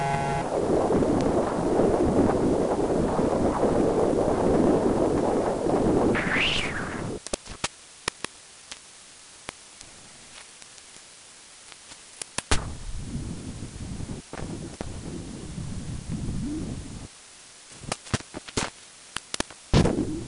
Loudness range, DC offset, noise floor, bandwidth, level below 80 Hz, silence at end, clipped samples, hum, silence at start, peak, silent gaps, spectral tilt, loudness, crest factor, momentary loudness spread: 16 LU; under 0.1%; -49 dBFS; 11.5 kHz; -40 dBFS; 0 s; under 0.1%; none; 0 s; -6 dBFS; none; -5 dB/octave; -26 LUFS; 22 dB; 22 LU